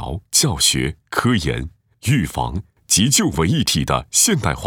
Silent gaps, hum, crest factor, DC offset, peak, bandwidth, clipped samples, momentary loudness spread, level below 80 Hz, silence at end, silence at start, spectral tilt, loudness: none; none; 18 dB; under 0.1%; -2 dBFS; over 20 kHz; under 0.1%; 12 LU; -36 dBFS; 0 s; 0 s; -3 dB/octave; -17 LUFS